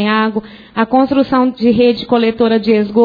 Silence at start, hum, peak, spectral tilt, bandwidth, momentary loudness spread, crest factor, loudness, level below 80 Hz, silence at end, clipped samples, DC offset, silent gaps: 0 s; none; 0 dBFS; -8.5 dB/octave; 5 kHz; 7 LU; 12 dB; -13 LUFS; -48 dBFS; 0 s; under 0.1%; under 0.1%; none